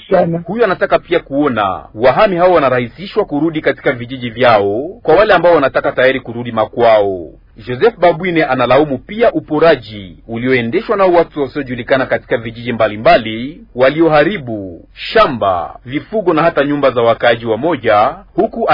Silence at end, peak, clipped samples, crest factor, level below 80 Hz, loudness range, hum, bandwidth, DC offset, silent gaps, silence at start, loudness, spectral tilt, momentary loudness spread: 0 s; 0 dBFS; under 0.1%; 12 dB; -42 dBFS; 2 LU; none; 6 kHz; under 0.1%; none; 0.1 s; -13 LUFS; -8.5 dB/octave; 11 LU